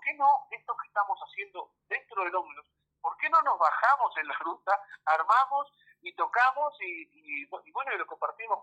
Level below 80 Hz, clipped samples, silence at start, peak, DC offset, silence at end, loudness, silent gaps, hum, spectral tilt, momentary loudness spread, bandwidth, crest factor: -88 dBFS; under 0.1%; 0 s; -12 dBFS; under 0.1%; 0 s; -29 LUFS; none; none; -2 dB/octave; 14 LU; 8.6 kHz; 18 dB